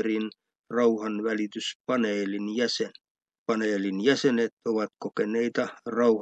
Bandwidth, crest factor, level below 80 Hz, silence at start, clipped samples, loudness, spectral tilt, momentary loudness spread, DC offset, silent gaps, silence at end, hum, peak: 8.8 kHz; 18 dB; -82 dBFS; 0 s; under 0.1%; -28 LUFS; -4.5 dB/octave; 8 LU; under 0.1%; 0.59-0.64 s, 1.75-1.84 s, 3.11-3.15 s, 3.38-3.46 s, 4.52-4.57 s; 0 s; none; -8 dBFS